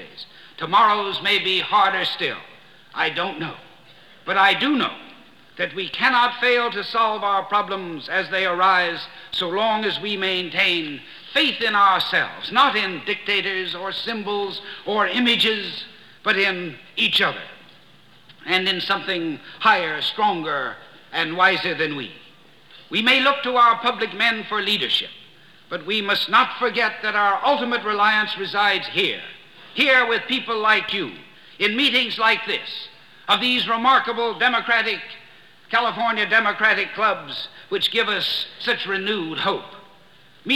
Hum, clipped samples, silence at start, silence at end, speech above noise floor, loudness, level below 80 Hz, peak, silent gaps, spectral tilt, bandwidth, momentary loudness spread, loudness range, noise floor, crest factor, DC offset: none; under 0.1%; 0 s; 0 s; 31 dB; -20 LUFS; -66 dBFS; -4 dBFS; none; -3.5 dB/octave; 18 kHz; 14 LU; 3 LU; -52 dBFS; 18 dB; 0.2%